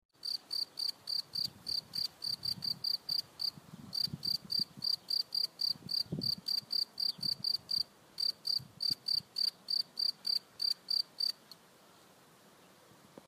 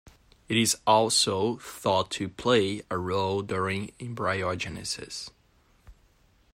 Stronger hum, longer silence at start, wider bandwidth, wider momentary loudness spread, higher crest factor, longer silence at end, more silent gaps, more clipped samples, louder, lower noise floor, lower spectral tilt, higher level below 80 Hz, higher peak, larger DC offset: neither; second, 0.25 s vs 0.5 s; about the same, 15.5 kHz vs 16 kHz; second, 5 LU vs 11 LU; second, 16 dB vs 22 dB; second, 0.05 s vs 0.6 s; neither; neither; second, -34 LUFS vs -27 LUFS; about the same, -62 dBFS vs -63 dBFS; second, -2 dB/octave vs -3.5 dB/octave; second, -76 dBFS vs -60 dBFS; second, -22 dBFS vs -8 dBFS; neither